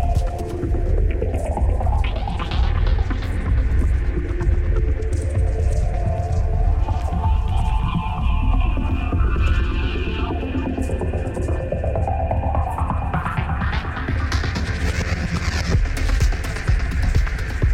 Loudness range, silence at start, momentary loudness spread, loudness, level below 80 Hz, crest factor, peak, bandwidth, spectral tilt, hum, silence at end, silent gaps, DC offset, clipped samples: 1 LU; 0 s; 3 LU; -22 LUFS; -20 dBFS; 14 dB; -6 dBFS; 11.5 kHz; -6.5 dB/octave; none; 0 s; none; under 0.1%; under 0.1%